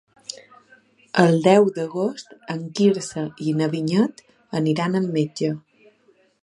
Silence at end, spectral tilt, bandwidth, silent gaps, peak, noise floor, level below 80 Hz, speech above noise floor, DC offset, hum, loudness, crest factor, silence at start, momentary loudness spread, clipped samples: 0.85 s; -6.5 dB/octave; 11.5 kHz; none; 0 dBFS; -60 dBFS; -68 dBFS; 39 dB; under 0.1%; none; -21 LUFS; 22 dB; 0.3 s; 18 LU; under 0.1%